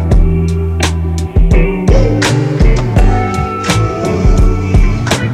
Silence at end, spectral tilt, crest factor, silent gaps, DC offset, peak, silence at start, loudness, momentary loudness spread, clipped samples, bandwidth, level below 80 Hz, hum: 0 s; -6 dB/octave; 8 dB; none; under 0.1%; 0 dBFS; 0 s; -12 LUFS; 3 LU; under 0.1%; 12.5 kHz; -12 dBFS; none